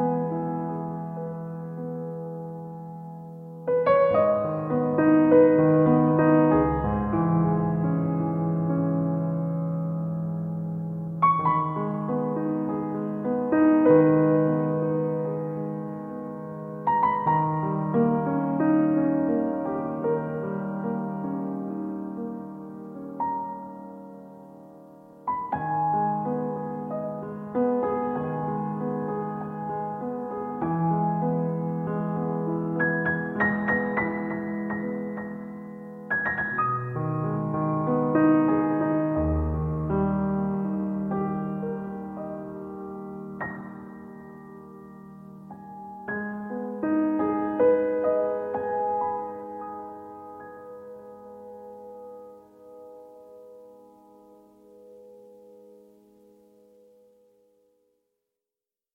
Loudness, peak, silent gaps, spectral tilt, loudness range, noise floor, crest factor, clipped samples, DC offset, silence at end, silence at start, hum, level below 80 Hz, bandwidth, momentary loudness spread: -26 LUFS; -6 dBFS; none; -11 dB/octave; 14 LU; under -90 dBFS; 20 dB; under 0.1%; under 0.1%; 3.2 s; 0 s; none; -48 dBFS; 4.1 kHz; 21 LU